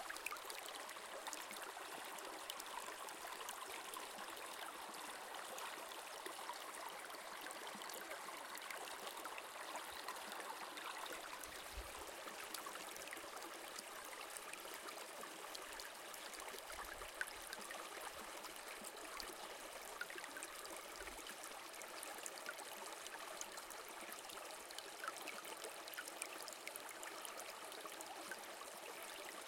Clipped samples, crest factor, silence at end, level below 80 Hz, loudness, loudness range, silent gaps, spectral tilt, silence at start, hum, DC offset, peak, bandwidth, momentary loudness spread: under 0.1%; 28 dB; 0 s; -74 dBFS; -50 LUFS; 1 LU; none; -0.5 dB/octave; 0 s; none; under 0.1%; -24 dBFS; 17 kHz; 2 LU